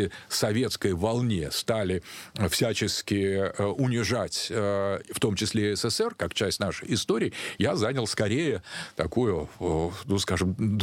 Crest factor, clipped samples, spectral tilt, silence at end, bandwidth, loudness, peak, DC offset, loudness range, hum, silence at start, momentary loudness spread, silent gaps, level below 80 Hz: 16 dB; under 0.1%; -4.5 dB/octave; 0 s; 16.5 kHz; -27 LUFS; -10 dBFS; under 0.1%; 1 LU; none; 0 s; 4 LU; none; -50 dBFS